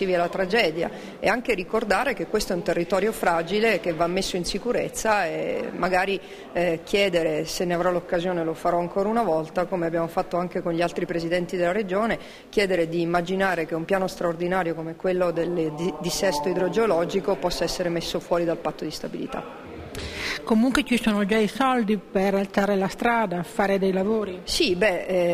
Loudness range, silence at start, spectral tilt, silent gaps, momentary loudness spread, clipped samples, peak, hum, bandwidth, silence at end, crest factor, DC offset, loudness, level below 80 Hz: 2 LU; 0 s; -5 dB/octave; none; 7 LU; under 0.1%; -6 dBFS; none; 15.5 kHz; 0 s; 18 dB; under 0.1%; -24 LUFS; -48 dBFS